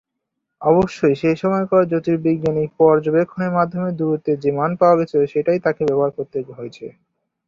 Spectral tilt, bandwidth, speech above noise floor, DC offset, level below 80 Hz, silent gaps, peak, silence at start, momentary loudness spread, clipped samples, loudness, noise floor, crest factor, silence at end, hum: -8.5 dB/octave; 7.4 kHz; 60 dB; under 0.1%; -54 dBFS; none; -2 dBFS; 0.6 s; 12 LU; under 0.1%; -18 LUFS; -78 dBFS; 16 dB; 0.55 s; none